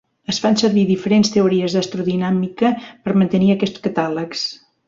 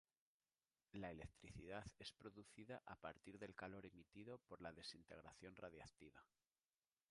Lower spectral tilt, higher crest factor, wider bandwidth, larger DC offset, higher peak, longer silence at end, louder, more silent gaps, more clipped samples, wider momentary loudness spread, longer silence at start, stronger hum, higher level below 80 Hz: about the same, -6 dB/octave vs -5 dB/octave; second, 14 dB vs 22 dB; second, 7.6 kHz vs 11 kHz; neither; first, -4 dBFS vs -38 dBFS; second, 0.3 s vs 0.85 s; first, -18 LUFS vs -59 LUFS; neither; neither; about the same, 8 LU vs 8 LU; second, 0.3 s vs 0.95 s; neither; first, -56 dBFS vs -76 dBFS